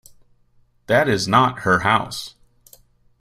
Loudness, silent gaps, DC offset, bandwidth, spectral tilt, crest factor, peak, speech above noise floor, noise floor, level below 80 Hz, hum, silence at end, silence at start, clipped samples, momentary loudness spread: -18 LUFS; none; under 0.1%; 16 kHz; -4.5 dB/octave; 20 dB; -2 dBFS; 40 dB; -58 dBFS; -52 dBFS; none; 0.9 s; 0.9 s; under 0.1%; 14 LU